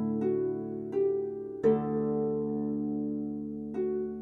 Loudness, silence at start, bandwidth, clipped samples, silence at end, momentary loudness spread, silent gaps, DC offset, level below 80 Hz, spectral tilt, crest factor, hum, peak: -31 LUFS; 0 s; 4 kHz; under 0.1%; 0 s; 8 LU; none; under 0.1%; -62 dBFS; -11 dB/octave; 16 dB; none; -14 dBFS